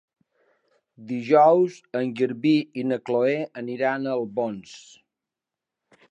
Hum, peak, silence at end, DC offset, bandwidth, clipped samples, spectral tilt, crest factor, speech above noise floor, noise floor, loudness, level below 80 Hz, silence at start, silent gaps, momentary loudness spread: none; -6 dBFS; 1.3 s; under 0.1%; 8.8 kHz; under 0.1%; -7 dB/octave; 18 dB; 65 dB; -88 dBFS; -23 LUFS; -78 dBFS; 1 s; none; 15 LU